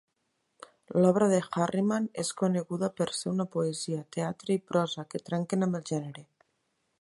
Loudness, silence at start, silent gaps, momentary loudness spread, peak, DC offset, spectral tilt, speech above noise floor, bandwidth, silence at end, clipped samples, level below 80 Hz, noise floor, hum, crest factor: -30 LUFS; 0.9 s; none; 9 LU; -10 dBFS; under 0.1%; -6 dB/octave; 49 dB; 11.5 kHz; 0.75 s; under 0.1%; -72 dBFS; -78 dBFS; none; 20 dB